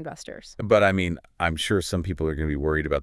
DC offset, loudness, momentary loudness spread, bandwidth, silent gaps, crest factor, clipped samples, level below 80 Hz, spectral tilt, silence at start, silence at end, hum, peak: under 0.1%; -24 LUFS; 16 LU; 12 kHz; none; 18 dB; under 0.1%; -40 dBFS; -5.5 dB/octave; 0 s; 0 s; none; -6 dBFS